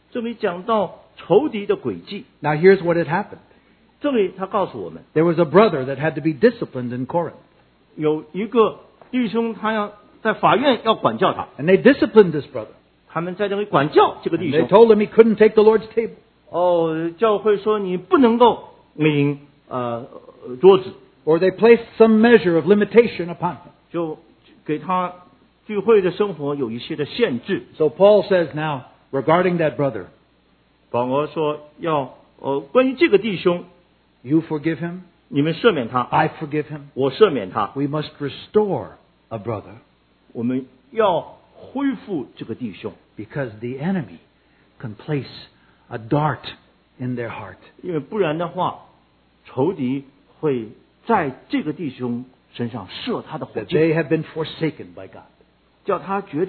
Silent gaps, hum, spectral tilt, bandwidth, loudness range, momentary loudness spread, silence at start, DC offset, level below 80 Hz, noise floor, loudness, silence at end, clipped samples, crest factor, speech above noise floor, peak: none; none; -10.5 dB/octave; 4.5 kHz; 10 LU; 17 LU; 0.15 s; under 0.1%; -60 dBFS; -59 dBFS; -19 LUFS; 0 s; under 0.1%; 20 dB; 40 dB; 0 dBFS